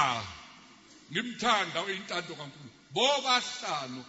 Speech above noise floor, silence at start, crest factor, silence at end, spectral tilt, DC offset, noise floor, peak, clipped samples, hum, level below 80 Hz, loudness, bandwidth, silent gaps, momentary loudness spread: 24 dB; 0 s; 22 dB; 0 s; -2.5 dB/octave; under 0.1%; -55 dBFS; -10 dBFS; under 0.1%; none; -70 dBFS; -30 LUFS; 8 kHz; none; 17 LU